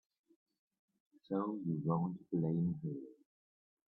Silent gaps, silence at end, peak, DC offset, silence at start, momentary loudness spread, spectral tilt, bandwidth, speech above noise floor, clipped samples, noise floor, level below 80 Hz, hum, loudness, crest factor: none; 0.8 s; -22 dBFS; under 0.1%; 1.3 s; 9 LU; -12.5 dB/octave; 4.1 kHz; over 53 dB; under 0.1%; under -90 dBFS; -78 dBFS; none; -38 LUFS; 20 dB